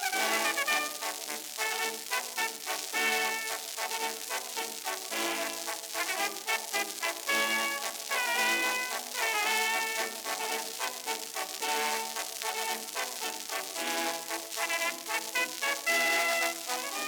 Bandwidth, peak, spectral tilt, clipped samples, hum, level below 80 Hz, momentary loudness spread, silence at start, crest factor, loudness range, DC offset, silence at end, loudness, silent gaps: over 20 kHz; -12 dBFS; 1 dB/octave; under 0.1%; none; -84 dBFS; 8 LU; 0 s; 20 dB; 4 LU; under 0.1%; 0 s; -30 LUFS; none